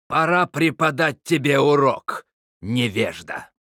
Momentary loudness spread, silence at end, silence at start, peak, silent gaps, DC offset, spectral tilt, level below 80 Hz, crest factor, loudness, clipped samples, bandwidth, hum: 16 LU; 0.3 s; 0.1 s; -4 dBFS; 2.33-2.60 s; under 0.1%; -5.5 dB/octave; -64 dBFS; 16 dB; -20 LUFS; under 0.1%; 17.5 kHz; none